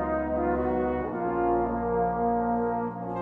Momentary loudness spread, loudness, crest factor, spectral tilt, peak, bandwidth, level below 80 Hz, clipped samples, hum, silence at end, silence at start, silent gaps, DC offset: 3 LU; -27 LUFS; 12 dB; -11 dB/octave; -14 dBFS; 3.9 kHz; -44 dBFS; under 0.1%; none; 0 s; 0 s; none; under 0.1%